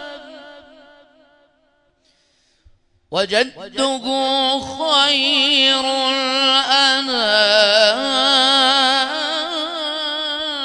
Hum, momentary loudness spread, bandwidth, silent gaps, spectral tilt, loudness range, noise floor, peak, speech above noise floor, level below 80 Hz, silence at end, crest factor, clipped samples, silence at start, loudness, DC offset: none; 10 LU; 11 kHz; none; -1 dB/octave; 11 LU; -61 dBFS; 0 dBFS; 45 dB; -60 dBFS; 0 s; 18 dB; under 0.1%; 0 s; -15 LUFS; under 0.1%